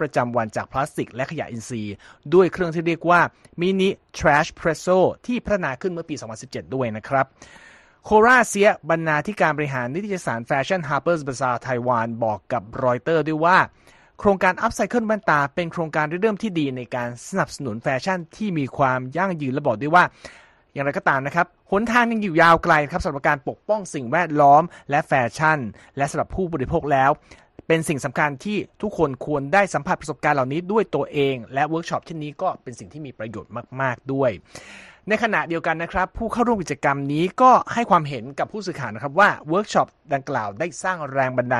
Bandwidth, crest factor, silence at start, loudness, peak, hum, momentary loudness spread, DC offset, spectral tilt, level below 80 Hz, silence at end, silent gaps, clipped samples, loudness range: 12.5 kHz; 20 dB; 0 s; -21 LUFS; -2 dBFS; none; 11 LU; under 0.1%; -5.5 dB/octave; -48 dBFS; 0 s; none; under 0.1%; 5 LU